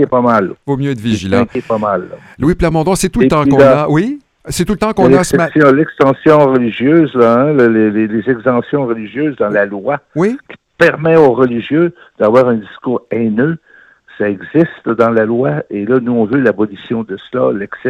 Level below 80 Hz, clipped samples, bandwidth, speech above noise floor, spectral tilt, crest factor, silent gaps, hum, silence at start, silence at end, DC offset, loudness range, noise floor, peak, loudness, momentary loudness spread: -38 dBFS; 0.2%; 15 kHz; 30 dB; -6.5 dB/octave; 12 dB; none; none; 0 s; 0 s; under 0.1%; 4 LU; -42 dBFS; 0 dBFS; -12 LUFS; 9 LU